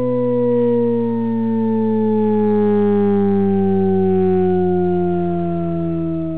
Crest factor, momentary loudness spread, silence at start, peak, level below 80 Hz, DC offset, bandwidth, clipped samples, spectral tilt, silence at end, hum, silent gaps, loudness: 8 dB; 5 LU; 0 s; -8 dBFS; -42 dBFS; 3%; 4 kHz; under 0.1%; -13.5 dB/octave; 0 s; none; none; -17 LUFS